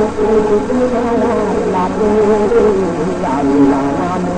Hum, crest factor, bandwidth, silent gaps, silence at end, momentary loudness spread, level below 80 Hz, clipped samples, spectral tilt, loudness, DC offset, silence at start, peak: none; 12 dB; 9.6 kHz; none; 0 s; 5 LU; -34 dBFS; under 0.1%; -7 dB/octave; -13 LUFS; under 0.1%; 0 s; -2 dBFS